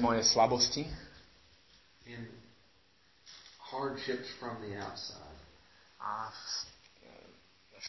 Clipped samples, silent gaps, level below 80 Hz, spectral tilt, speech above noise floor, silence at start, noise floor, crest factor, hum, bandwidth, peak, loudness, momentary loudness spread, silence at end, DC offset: under 0.1%; none; -60 dBFS; -3 dB/octave; 34 dB; 0 s; -68 dBFS; 24 dB; none; 6.2 kHz; -14 dBFS; -34 LUFS; 25 LU; 0 s; under 0.1%